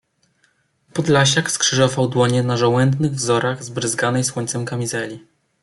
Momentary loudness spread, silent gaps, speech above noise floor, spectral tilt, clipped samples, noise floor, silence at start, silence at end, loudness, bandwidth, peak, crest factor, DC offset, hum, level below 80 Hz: 9 LU; none; 44 dB; -4 dB/octave; under 0.1%; -63 dBFS; 0.95 s; 0.45 s; -18 LUFS; 12 kHz; -2 dBFS; 16 dB; under 0.1%; none; -58 dBFS